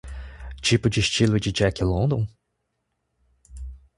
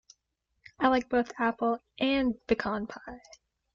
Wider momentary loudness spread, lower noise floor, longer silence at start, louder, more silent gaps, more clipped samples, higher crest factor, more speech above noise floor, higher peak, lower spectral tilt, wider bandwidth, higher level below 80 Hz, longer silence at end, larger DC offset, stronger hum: first, 20 LU vs 15 LU; second, -76 dBFS vs -80 dBFS; second, 0.05 s vs 0.8 s; first, -22 LUFS vs -29 LUFS; neither; neither; about the same, 20 dB vs 20 dB; first, 55 dB vs 51 dB; first, -6 dBFS vs -12 dBFS; about the same, -5 dB/octave vs -5.5 dB/octave; first, 11.5 kHz vs 7.4 kHz; first, -38 dBFS vs -58 dBFS; second, 0.2 s vs 0.55 s; neither; neither